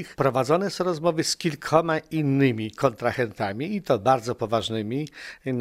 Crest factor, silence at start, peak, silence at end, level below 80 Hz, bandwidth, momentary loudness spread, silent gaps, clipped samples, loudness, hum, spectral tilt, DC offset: 20 dB; 0 s; -4 dBFS; 0 s; -58 dBFS; 16 kHz; 8 LU; none; under 0.1%; -24 LUFS; none; -5.5 dB/octave; under 0.1%